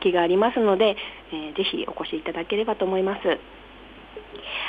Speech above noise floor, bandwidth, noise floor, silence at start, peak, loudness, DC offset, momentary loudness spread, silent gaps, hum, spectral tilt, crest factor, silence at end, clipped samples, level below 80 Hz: 19 dB; 5 kHz; -43 dBFS; 0 s; -8 dBFS; -24 LUFS; under 0.1%; 22 LU; none; none; -7 dB/octave; 16 dB; 0 s; under 0.1%; -54 dBFS